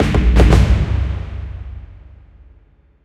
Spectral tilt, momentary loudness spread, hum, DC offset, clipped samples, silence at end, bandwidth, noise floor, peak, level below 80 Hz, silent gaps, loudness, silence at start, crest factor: -7 dB/octave; 21 LU; none; under 0.1%; under 0.1%; 1.1 s; 9.6 kHz; -50 dBFS; 0 dBFS; -18 dBFS; none; -15 LUFS; 0 s; 16 dB